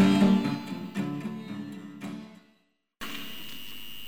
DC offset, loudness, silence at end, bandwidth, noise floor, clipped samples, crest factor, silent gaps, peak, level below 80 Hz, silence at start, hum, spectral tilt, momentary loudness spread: under 0.1%; -31 LUFS; 0 s; over 20 kHz; -70 dBFS; under 0.1%; 18 dB; none; -12 dBFS; -62 dBFS; 0 s; none; -6.5 dB/octave; 18 LU